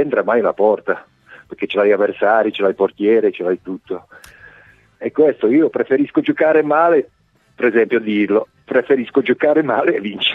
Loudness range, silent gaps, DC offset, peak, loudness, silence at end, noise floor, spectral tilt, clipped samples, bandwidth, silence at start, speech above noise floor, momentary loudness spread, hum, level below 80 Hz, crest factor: 3 LU; none; under 0.1%; -2 dBFS; -16 LUFS; 0 s; -48 dBFS; -7 dB/octave; under 0.1%; 5.4 kHz; 0 s; 32 dB; 10 LU; none; -62 dBFS; 14 dB